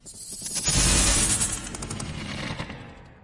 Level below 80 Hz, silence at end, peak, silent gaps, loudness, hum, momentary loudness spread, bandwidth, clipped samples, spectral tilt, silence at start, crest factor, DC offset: -34 dBFS; 0.05 s; -8 dBFS; none; -23 LUFS; none; 17 LU; 11.5 kHz; under 0.1%; -2 dB/octave; 0.05 s; 18 dB; under 0.1%